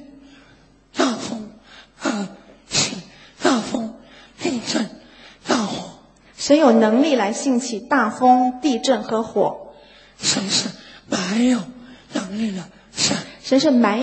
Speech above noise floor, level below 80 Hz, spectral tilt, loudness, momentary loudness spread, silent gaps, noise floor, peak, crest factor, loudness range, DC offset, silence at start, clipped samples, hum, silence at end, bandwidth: 35 dB; -60 dBFS; -3.5 dB/octave; -20 LUFS; 17 LU; none; -52 dBFS; 0 dBFS; 20 dB; 7 LU; under 0.1%; 0 s; under 0.1%; none; 0 s; 8.8 kHz